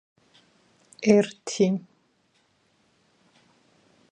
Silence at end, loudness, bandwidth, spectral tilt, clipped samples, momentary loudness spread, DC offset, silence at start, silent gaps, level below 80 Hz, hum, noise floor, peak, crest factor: 2.35 s; -24 LUFS; 9.8 kHz; -5.5 dB/octave; under 0.1%; 9 LU; under 0.1%; 1 s; none; -72 dBFS; none; -67 dBFS; -6 dBFS; 22 dB